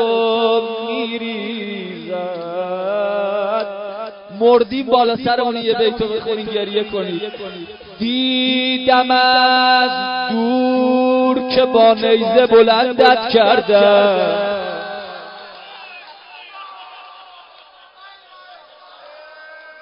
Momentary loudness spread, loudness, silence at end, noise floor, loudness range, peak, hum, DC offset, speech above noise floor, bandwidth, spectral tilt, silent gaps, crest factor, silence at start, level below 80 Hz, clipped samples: 22 LU; -15 LUFS; 0.1 s; -45 dBFS; 10 LU; 0 dBFS; none; under 0.1%; 30 dB; 5.4 kHz; -7 dB/octave; none; 16 dB; 0 s; -56 dBFS; under 0.1%